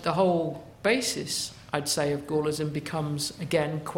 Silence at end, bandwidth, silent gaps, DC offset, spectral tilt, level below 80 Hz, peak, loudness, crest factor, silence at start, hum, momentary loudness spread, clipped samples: 0 s; 16.5 kHz; none; under 0.1%; -4 dB/octave; -60 dBFS; -10 dBFS; -28 LUFS; 18 dB; 0 s; none; 6 LU; under 0.1%